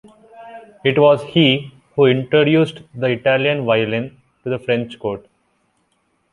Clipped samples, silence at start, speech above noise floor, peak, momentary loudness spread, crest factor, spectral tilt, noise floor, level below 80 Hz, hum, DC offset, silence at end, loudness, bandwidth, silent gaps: under 0.1%; 0.35 s; 49 dB; -2 dBFS; 14 LU; 16 dB; -7.5 dB/octave; -65 dBFS; -58 dBFS; none; under 0.1%; 1.15 s; -17 LUFS; 11 kHz; none